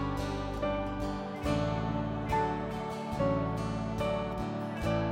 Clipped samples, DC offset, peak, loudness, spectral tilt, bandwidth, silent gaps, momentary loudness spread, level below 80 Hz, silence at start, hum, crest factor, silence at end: under 0.1%; under 0.1%; -18 dBFS; -33 LUFS; -7 dB/octave; 16.5 kHz; none; 5 LU; -44 dBFS; 0 s; none; 14 dB; 0 s